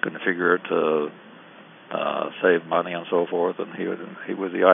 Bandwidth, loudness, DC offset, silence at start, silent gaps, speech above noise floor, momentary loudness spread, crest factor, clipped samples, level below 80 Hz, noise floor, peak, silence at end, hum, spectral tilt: 3.8 kHz; -24 LUFS; under 0.1%; 0 s; none; 24 dB; 10 LU; 22 dB; under 0.1%; under -90 dBFS; -47 dBFS; -2 dBFS; 0 s; none; -10 dB/octave